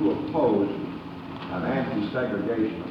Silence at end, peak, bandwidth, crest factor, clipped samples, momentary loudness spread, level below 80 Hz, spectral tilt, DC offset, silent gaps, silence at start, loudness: 0 s; -12 dBFS; 5.8 kHz; 16 dB; under 0.1%; 13 LU; -56 dBFS; -9 dB/octave; under 0.1%; none; 0 s; -27 LUFS